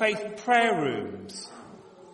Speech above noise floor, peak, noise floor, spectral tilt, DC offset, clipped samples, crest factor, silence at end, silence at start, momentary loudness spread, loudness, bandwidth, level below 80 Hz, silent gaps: 22 dB; -8 dBFS; -49 dBFS; -4 dB/octave; under 0.1%; under 0.1%; 20 dB; 0 s; 0 s; 19 LU; -26 LUFS; 11.5 kHz; -72 dBFS; none